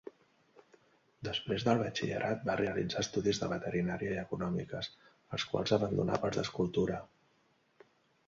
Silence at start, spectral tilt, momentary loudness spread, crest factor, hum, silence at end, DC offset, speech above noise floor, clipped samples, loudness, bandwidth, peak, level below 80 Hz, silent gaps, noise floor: 1.2 s; -5.5 dB/octave; 10 LU; 22 dB; none; 1.2 s; under 0.1%; 38 dB; under 0.1%; -35 LUFS; 7.6 kHz; -14 dBFS; -60 dBFS; none; -72 dBFS